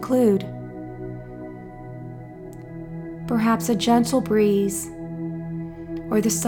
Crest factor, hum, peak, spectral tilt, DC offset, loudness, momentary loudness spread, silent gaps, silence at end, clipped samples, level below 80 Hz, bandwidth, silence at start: 18 dB; none; -6 dBFS; -5.5 dB/octave; under 0.1%; -23 LUFS; 18 LU; none; 0 s; under 0.1%; -50 dBFS; 18 kHz; 0 s